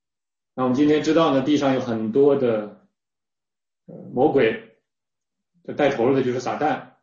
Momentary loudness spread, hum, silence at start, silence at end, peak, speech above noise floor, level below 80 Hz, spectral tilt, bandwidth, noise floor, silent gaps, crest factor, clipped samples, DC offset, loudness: 11 LU; none; 0.55 s; 0.15 s; -6 dBFS; over 70 dB; -60 dBFS; -6.5 dB/octave; 7.4 kHz; under -90 dBFS; none; 16 dB; under 0.1%; under 0.1%; -21 LUFS